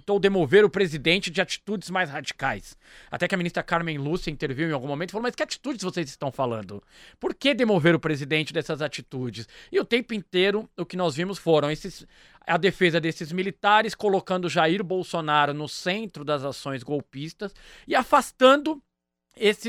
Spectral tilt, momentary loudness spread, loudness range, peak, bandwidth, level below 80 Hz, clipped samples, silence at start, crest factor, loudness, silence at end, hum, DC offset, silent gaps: -5 dB/octave; 13 LU; 5 LU; -4 dBFS; 15 kHz; -54 dBFS; under 0.1%; 0.05 s; 20 dB; -25 LUFS; 0 s; none; under 0.1%; none